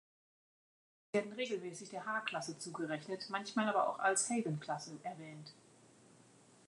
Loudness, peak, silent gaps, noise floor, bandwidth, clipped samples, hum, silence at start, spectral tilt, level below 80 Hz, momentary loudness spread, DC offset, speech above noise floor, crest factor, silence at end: -39 LUFS; -20 dBFS; none; -65 dBFS; 11 kHz; under 0.1%; none; 1.15 s; -3.5 dB/octave; -90 dBFS; 14 LU; under 0.1%; 26 dB; 20 dB; 0.5 s